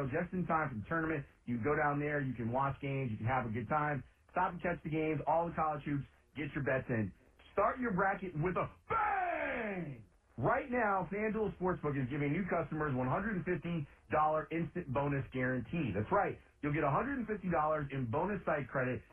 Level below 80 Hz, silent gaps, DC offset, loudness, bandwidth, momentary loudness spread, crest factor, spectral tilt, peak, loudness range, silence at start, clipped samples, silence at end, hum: -58 dBFS; none; under 0.1%; -36 LUFS; 3.7 kHz; 6 LU; 16 dB; -10 dB/octave; -20 dBFS; 1 LU; 0 s; under 0.1%; 0.1 s; none